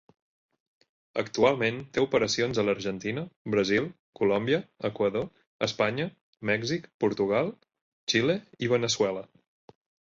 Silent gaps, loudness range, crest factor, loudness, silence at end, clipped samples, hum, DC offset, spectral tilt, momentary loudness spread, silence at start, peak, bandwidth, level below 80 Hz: 3.36-3.45 s, 3.99-4.13 s, 5.47-5.59 s, 6.21-6.33 s, 6.94-6.99 s, 7.81-8.07 s; 2 LU; 20 dB; -28 LUFS; 0.85 s; under 0.1%; none; under 0.1%; -4.5 dB/octave; 10 LU; 1.15 s; -10 dBFS; 7.8 kHz; -62 dBFS